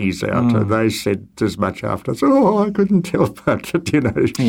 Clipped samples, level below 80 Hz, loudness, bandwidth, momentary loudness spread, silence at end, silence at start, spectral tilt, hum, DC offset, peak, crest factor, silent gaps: under 0.1%; -46 dBFS; -18 LUFS; 17 kHz; 8 LU; 0 s; 0 s; -6.5 dB/octave; none; under 0.1%; -2 dBFS; 16 dB; none